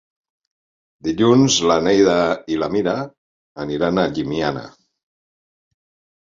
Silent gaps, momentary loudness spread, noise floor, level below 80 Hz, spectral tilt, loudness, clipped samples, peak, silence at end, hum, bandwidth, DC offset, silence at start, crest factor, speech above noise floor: 3.18-3.55 s; 13 LU; under -90 dBFS; -50 dBFS; -4.5 dB/octave; -18 LUFS; under 0.1%; -2 dBFS; 1.5 s; none; 7.8 kHz; under 0.1%; 1.05 s; 18 dB; over 73 dB